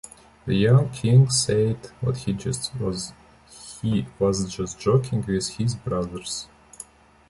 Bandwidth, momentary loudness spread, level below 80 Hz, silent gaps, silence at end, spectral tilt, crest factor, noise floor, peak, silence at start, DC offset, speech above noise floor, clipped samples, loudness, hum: 11.5 kHz; 22 LU; -48 dBFS; none; 0.45 s; -5.5 dB/octave; 18 dB; -46 dBFS; -6 dBFS; 0.05 s; under 0.1%; 24 dB; under 0.1%; -23 LUFS; none